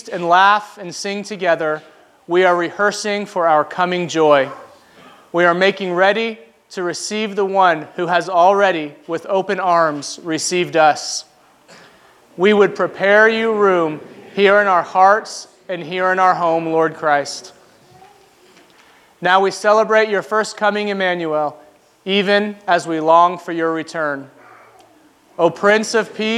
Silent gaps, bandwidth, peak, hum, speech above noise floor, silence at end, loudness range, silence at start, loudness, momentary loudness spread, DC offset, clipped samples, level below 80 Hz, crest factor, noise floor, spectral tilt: none; 13.5 kHz; 0 dBFS; none; 35 dB; 0 s; 4 LU; 0.05 s; -16 LUFS; 12 LU; under 0.1%; under 0.1%; -74 dBFS; 18 dB; -51 dBFS; -4 dB/octave